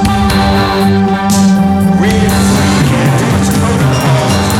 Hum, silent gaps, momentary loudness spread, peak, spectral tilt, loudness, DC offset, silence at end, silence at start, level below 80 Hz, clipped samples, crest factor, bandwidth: none; none; 2 LU; 0 dBFS; -5.5 dB/octave; -10 LUFS; under 0.1%; 0 s; 0 s; -24 dBFS; under 0.1%; 8 dB; 16.5 kHz